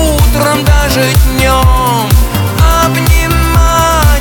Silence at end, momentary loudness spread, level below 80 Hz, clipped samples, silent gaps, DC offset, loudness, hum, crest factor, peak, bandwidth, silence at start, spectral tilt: 0 s; 2 LU; -12 dBFS; 0.4%; none; under 0.1%; -9 LUFS; none; 8 dB; 0 dBFS; over 20 kHz; 0 s; -4.5 dB/octave